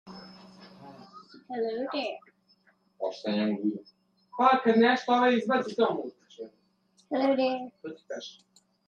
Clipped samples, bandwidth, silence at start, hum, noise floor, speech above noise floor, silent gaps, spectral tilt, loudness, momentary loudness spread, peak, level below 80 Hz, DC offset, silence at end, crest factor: under 0.1%; 7.6 kHz; 0.05 s; none; -68 dBFS; 40 dB; none; -5.5 dB/octave; -27 LUFS; 23 LU; -8 dBFS; -80 dBFS; under 0.1%; 0.55 s; 22 dB